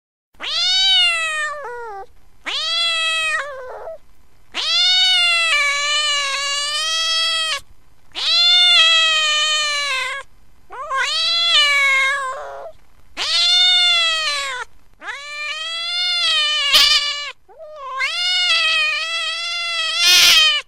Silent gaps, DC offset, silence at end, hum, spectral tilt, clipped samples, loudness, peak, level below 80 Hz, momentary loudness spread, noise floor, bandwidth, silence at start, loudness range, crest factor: none; 0.9%; 0.05 s; none; 3 dB/octave; under 0.1%; -14 LUFS; 0 dBFS; -52 dBFS; 20 LU; -50 dBFS; 16 kHz; 0.4 s; 4 LU; 18 dB